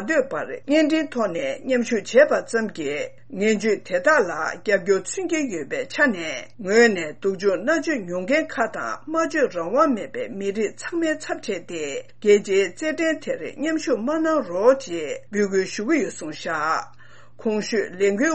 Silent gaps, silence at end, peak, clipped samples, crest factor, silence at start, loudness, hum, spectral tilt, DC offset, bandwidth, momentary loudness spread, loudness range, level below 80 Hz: none; 0 s; -4 dBFS; under 0.1%; 18 dB; 0 s; -22 LUFS; none; -4 dB/octave; 0.7%; 8.8 kHz; 10 LU; 3 LU; -66 dBFS